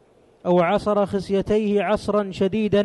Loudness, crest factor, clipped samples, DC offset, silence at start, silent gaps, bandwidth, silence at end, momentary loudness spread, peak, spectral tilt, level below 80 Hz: -21 LUFS; 14 dB; under 0.1%; under 0.1%; 0.45 s; none; 11.5 kHz; 0 s; 5 LU; -8 dBFS; -7 dB/octave; -48 dBFS